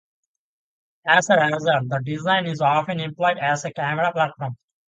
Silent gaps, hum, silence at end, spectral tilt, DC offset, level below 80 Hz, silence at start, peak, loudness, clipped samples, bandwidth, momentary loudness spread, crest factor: none; none; 0.35 s; -4.5 dB/octave; under 0.1%; -66 dBFS; 1.05 s; -2 dBFS; -21 LUFS; under 0.1%; 9.4 kHz; 9 LU; 20 dB